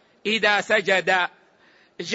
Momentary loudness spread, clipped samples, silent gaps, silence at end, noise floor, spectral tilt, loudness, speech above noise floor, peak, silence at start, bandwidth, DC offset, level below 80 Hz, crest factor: 9 LU; under 0.1%; none; 0 s; -57 dBFS; -3 dB/octave; -21 LUFS; 36 dB; -6 dBFS; 0.25 s; 8 kHz; under 0.1%; -70 dBFS; 18 dB